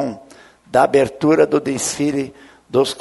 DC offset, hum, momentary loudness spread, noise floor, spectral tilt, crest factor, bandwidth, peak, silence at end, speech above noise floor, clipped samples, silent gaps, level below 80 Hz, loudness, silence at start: under 0.1%; none; 12 LU; -45 dBFS; -4.5 dB/octave; 18 dB; 12 kHz; 0 dBFS; 0 s; 29 dB; under 0.1%; none; -54 dBFS; -17 LUFS; 0 s